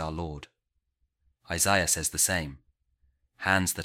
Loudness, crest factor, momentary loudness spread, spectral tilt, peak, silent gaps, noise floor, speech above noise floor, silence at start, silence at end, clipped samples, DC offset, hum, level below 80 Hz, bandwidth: -26 LUFS; 22 dB; 15 LU; -2.5 dB/octave; -8 dBFS; none; -77 dBFS; 49 dB; 0 s; 0 s; under 0.1%; under 0.1%; none; -50 dBFS; 16.5 kHz